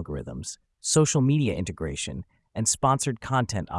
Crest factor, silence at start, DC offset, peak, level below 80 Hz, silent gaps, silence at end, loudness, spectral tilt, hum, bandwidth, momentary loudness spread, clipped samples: 18 dB; 0 s; under 0.1%; -8 dBFS; -48 dBFS; none; 0 s; -25 LUFS; -4.5 dB/octave; none; 12 kHz; 15 LU; under 0.1%